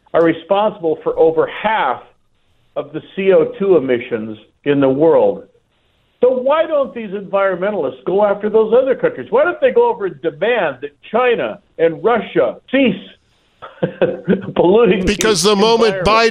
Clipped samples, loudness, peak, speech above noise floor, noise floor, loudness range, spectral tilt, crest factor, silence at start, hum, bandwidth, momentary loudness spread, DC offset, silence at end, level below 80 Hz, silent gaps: under 0.1%; -15 LUFS; 0 dBFS; 45 dB; -59 dBFS; 2 LU; -5 dB/octave; 14 dB; 0.15 s; none; 14 kHz; 12 LU; under 0.1%; 0 s; -46 dBFS; none